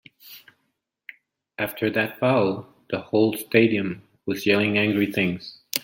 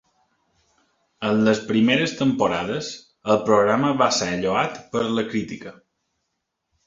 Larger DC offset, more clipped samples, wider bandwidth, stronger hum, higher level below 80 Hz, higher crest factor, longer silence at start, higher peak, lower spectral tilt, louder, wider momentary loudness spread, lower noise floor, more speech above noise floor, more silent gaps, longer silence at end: neither; neither; first, 17 kHz vs 7.8 kHz; neither; second, -66 dBFS vs -58 dBFS; about the same, 24 dB vs 20 dB; second, 0.25 s vs 1.2 s; first, 0 dBFS vs -4 dBFS; about the same, -5.5 dB/octave vs -4.5 dB/octave; about the same, -23 LUFS vs -21 LUFS; first, 15 LU vs 12 LU; about the same, -75 dBFS vs -78 dBFS; second, 53 dB vs 57 dB; neither; second, 0.05 s vs 1.15 s